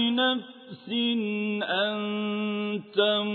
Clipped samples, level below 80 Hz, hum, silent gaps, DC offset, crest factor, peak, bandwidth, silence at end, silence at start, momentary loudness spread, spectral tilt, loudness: under 0.1%; -82 dBFS; none; none; under 0.1%; 16 dB; -10 dBFS; 4.5 kHz; 0 s; 0 s; 8 LU; -7.5 dB/octave; -27 LUFS